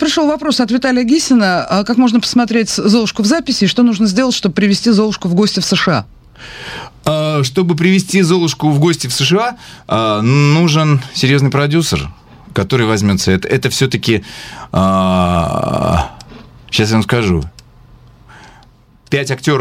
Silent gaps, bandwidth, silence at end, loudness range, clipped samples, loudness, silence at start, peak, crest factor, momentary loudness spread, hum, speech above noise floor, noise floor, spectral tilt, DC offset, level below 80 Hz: none; 16 kHz; 0 s; 3 LU; under 0.1%; -13 LUFS; 0 s; 0 dBFS; 14 dB; 8 LU; none; 33 dB; -45 dBFS; -5 dB/octave; under 0.1%; -38 dBFS